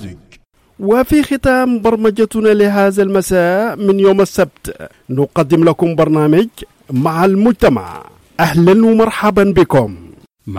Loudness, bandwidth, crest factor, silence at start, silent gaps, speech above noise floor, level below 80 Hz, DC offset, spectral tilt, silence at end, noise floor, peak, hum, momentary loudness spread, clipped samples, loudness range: -12 LUFS; 16.5 kHz; 10 dB; 0 s; none; 36 dB; -36 dBFS; under 0.1%; -6.5 dB/octave; 0 s; -48 dBFS; -2 dBFS; none; 11 LU; under 0.1%; 1 LU